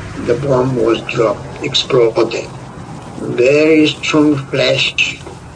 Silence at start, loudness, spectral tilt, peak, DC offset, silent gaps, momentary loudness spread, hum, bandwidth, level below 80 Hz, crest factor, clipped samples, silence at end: 0 s; -13 LUFS; -5 dB/octave; 0 dBFS; under 0.1%; none; 18 LU; none; 10.5 kHz; -42 dBFS; 14 dB; under 0.1%; 0 s